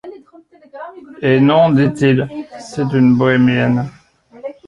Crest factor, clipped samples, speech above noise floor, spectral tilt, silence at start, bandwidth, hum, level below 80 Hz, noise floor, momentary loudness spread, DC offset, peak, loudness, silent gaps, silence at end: 14 dB; under 0.1%; 32 dB; -7.5 dB/octave; 0.05 s; 10 kHz; none; -52 dBFS; -45 dBFS; 21 LU; under 0.1%; -2 dBFS; -14 LUFS; none; 0.15 s